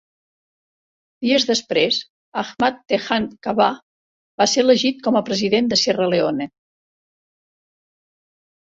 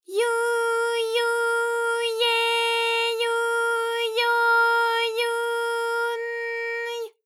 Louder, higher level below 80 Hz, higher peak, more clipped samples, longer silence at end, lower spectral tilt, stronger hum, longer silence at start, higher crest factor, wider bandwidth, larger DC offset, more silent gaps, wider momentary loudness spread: first, -19 LUFS vs -23 LUFS; first, -62 dBFS vs under -90 dBFS; first, -2 dBFS vs -10 dBFS; neither; first, 2.15 s vs 0.15 s; first, -3.5 dB/octave vs 3.5 dB/octave; neither; first, 1.2 s vs 0.1 s; first, 20 dB vs 12 dB; second, 8 kHz vs 16 kHz; neither; first, 2.10-2.32 s, 3.82-4.38 s vs none; first, 11 LU vs 8 LU